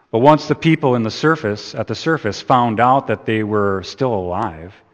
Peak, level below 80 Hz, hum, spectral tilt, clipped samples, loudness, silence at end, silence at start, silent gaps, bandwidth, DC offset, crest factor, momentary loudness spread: 0 dBFS; -52 dBFS; none; -6.5 dB/octave; under 0.1%; -17 LUFS; 0.2 s; 0.15 s; none; 8.6 kHz; under 0.1%; 16 dB; 10 LU